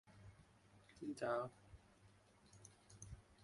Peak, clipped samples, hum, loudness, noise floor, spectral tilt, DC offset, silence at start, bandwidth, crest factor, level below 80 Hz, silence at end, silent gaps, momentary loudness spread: -30 dBFS; under 0.1%; none; -48 LUFS; -70 dBFS; -5.5 dB/octave; under 0.1%; 0.05 s; 11.5 kHz; 22 dB; -70 dBFS; 0 s; none; 25 LU